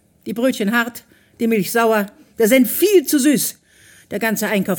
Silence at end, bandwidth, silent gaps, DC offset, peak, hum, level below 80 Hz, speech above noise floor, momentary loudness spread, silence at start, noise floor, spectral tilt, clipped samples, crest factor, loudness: 0 s; 17.5 kHz; none; under 0.1%; -2 dBFS; none; -64 dBFS; 32 dB; 10 LU; 0.25 s; -49 dBFS; -4 dB/octave; under 0.1%; 16 dB; -17 LUFS